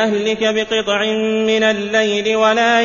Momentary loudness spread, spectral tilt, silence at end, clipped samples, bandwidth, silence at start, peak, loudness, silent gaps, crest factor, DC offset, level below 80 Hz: 4 LU; -3.5 dB/octave; 0 s; under 0.1%; 7.4 kHz; 0 s; -2 dBFS; -16 LUFS; none; 14 dB; under 0.1%; -54 dBFS